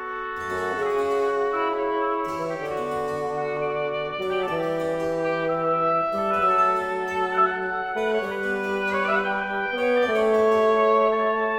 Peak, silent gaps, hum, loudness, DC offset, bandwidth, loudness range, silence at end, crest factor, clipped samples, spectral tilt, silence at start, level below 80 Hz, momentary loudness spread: -8 dBFS; none; none; -24 LUFS; under 0.1%; 16 kHz; 4 LU; 0 s; 14 dB; under 0.1%; -5.5 dB/octave; 0 s; -56 dBFS; 8 LU